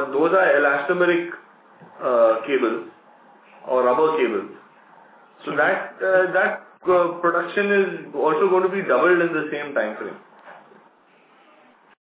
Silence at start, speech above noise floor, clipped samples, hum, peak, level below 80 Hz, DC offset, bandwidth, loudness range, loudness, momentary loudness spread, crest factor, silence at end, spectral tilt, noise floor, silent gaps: 0 s; 35 dB; under 0.1%; none; -6 dBFS; -78 dBFS; under 0.1%; 4 kHz; 4 LU; -20 LUFS; 12 LU; 16 dB; 1.45 s; -9 dB/octave; -55 dBFS; none